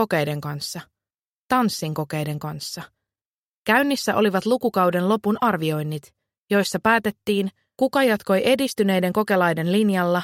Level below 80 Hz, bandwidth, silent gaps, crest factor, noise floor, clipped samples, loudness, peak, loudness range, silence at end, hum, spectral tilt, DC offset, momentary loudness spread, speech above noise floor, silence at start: -62 dBFS; 16.5 kHz; 1.14-1.18 s, 1.24-1.47 s, 3.25-3.65 s, 6.38-6.47 s; 18 dB; under -90 dBFS; under 0.1%; -22 LUFS; -4 dBFS; 5 LU; 0 s; none; -5.5 dB/octave; under 0.1%; 11 LU; over 69 dB; 0 s